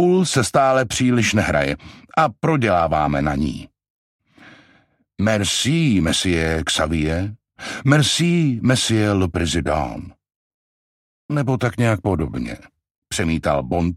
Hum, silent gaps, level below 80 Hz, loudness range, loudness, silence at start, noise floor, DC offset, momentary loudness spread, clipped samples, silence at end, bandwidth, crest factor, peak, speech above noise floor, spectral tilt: none; 3.90-4.19 s, 10.36-11.29 s, 12.91-13.02 s; -38 dBFS; 5 LU; -19 LUFS; 0 s; -58 dBFS; under 0.1%; 10 LU; under 0.1%; 0 s; 15.5 kHz; 18 dB; -2 dBFS; 39 dB; -5 dB/octave